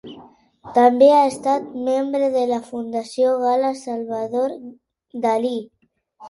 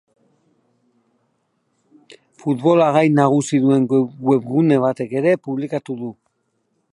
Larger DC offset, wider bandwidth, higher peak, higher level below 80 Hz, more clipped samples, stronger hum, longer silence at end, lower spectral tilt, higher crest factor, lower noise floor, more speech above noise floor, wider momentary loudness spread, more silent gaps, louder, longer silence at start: neither; about the same, 11.5 kHz vs 11.5 kHz; about the same, -2 dBFS vs 0 dBFS; about the same, -68 dBFS vs -68 dBFS; neither; neither; second, 0 s vs 0.8 s; second, -5 dB/octave vs -7 dB/octave; about the same, 18 dB vs 18 dB; second, -53 dBFS vs -69 dBFS; second, 34 dB vs 52 dB; first, 14 LU vs 11 LU; neither; about the same, -19 LUFS vs -17 LUFS; second, 0.05 s vs 2.1 s